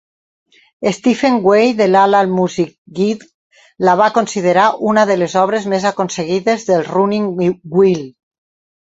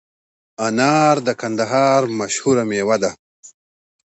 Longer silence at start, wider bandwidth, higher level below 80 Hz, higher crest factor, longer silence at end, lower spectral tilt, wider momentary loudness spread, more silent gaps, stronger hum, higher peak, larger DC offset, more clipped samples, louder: first, 0.8 s vs 0.6 s; about the same, 8 kHz vs 8.2 kHz; about the same, -58 dBFS vs -62 dBFS; about the same, 14 dB vs 16 dB; first, 0.8 s vs 0.65 s; about the same, -5.5 dB/octave vs -4.5 dB/octave; about the same, 8 LU vs 7 LU; about the same, 2.78-2.85 s, 3.34-3.50 s vs 3.19-3.43 s; neither; about the same, -2 dBFS vs -2 dBFS; neither; neither; first, -14 LUFS vs -17 LUFS